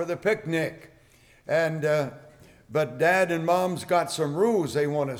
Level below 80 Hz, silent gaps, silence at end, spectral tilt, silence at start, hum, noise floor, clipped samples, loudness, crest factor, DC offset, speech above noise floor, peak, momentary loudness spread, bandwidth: -64 dBFS; none; 0 s; -5.5 dB/octave; 0 s; none; -57 dBFS; under 0.1%; -25 LUFS; 16 dB; under 0.1%; 32 dB; -10 dBFS; 6 LU; 19.5 kHz